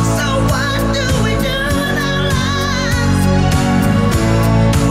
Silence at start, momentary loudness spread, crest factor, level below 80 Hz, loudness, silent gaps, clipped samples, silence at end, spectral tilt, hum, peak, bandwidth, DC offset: 0 s; 3 LU; 10 dB; -24 dBFS; -14 LUFS; none; under 0.1%; 0 s; -5.5 dB/octave; none; -2 dBFS; 16 kHz; under 0.1%